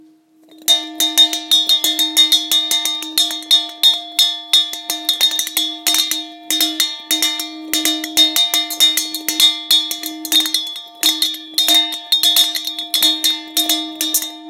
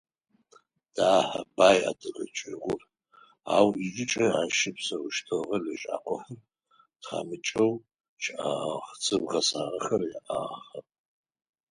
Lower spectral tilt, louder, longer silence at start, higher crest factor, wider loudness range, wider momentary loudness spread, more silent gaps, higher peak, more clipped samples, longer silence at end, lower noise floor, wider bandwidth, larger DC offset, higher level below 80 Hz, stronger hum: second, 2.5 dB/octave vs -3.5 dB/octave; first, -14 LUFS vs -28 LUFS; second, 0.65 s vs 0.95 s; second, 18 dB vs 24 dB; second, 3 LU vs 6 LU; second, 8 LU vs 14 LU; second, none vs 8.09-8.17 s; first, 0 dBFS vs -6 dBFS; neither; second, 0 s vs 0.9 s; second, -49 dBFS vs -66 dBFS; first, 17 kHz vs 11.5 kHz; neither; about the same, -70 dBFS vs -68 dBFS; neither